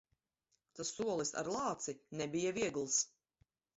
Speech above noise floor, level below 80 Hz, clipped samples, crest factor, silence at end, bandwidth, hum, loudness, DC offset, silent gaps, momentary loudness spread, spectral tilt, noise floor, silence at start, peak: 45 dB; -74 dBFS; under 0.1%; 18 dB; 0.7 s; 8 kHz; none; -38 LUFS; under 0.1%; none; 9 LU; -4 dB/octave; -84 dBFS; 0.75 s; -22 dBFS